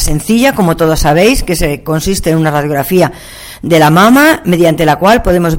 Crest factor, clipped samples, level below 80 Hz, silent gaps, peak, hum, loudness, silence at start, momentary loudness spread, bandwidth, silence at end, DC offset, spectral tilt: 8 dB; under 0.1%; -22 dBFS; none; 0 dBFS; none; -9 LUFS; 0 s; 8 LU; 17 kHz; 0 s; under 0.1%; -5 dB/octave